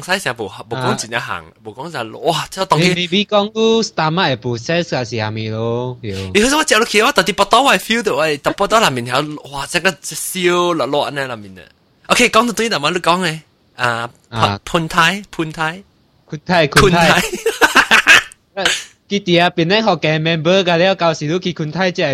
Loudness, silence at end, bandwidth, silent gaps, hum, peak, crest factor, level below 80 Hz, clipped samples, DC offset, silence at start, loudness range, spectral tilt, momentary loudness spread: -15 LUFS; 0 s; 16.5 kHz; none; none; 0 dBFS; 16 dB; -42 dBFS; under 0.1%; under 0.1%; 0 s; 5 LU; -3.5 dB/octave; 13 LU